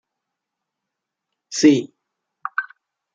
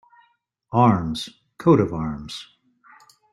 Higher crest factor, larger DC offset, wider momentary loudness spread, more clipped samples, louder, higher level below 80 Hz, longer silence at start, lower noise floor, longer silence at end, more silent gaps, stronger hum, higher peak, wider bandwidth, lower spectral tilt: about the same, 22 dB vs 20 dB; neither; first, 22 LU vs 18 LU; neither; about the same, -19 LUFS vs -21 LUFS; second, -70 dBFS vs -50 dBFS; first, 1.5 s vs 0.7 s; first, -82 dBFS vs -65 dBFS; second, 0.5 s vs 0.9 s; neither; neither; about the same, -2 dBFS vs -4 dBFS; second, 9 kHz vs 12.5 kHz; second, -4 dB/octave vs -7.5 dB/octave